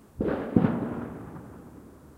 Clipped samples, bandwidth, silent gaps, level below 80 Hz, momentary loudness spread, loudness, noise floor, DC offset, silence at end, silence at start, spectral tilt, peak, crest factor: under 0.1%; 13.5 kHz; none; -50 dBFS; 23 LU; -28 LUFS; -49 dBFS; under 0.1%; 0 s; 0.15 s; -9.5 dB/octave; -4 dBFS; 26 dB